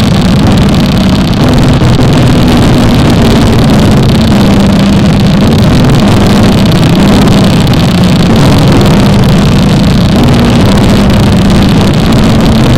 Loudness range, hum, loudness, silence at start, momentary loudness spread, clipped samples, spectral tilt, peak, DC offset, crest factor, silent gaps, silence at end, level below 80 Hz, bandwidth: 0 LU; none; -5 LUFS; 0 s; 1 LU; 0.3%; -6.5 dB/octave; 0 dBFS; 3%; 4 dB; none; 0 s; -14 dBFS; 16.5 kHz